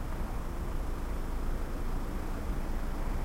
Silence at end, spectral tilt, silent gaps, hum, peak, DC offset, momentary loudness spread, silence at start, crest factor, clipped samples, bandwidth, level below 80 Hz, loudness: 0 s; -6.5 dB/octave; none; none; -22 dBFS; under 0.1%; 1 LU; 0 s; 10 dB; under 0.1%; 16 kHz; -34 dBFS; -39 LUFS